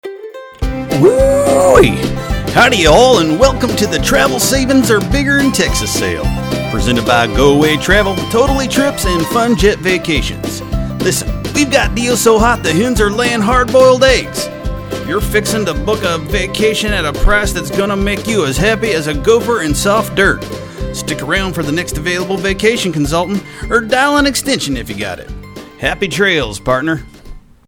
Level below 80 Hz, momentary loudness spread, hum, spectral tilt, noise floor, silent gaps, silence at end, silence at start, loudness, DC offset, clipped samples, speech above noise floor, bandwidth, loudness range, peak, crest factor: -24 dBFS; 11 LU; none; -4 dB/octave; -33 dBFS; none; 0.3 s; 0.05 s; -13 LUFS; under 0.1%; 0.2%; 21 dB; 19 kHz; 5 LU; 0 dBFS; 12 dB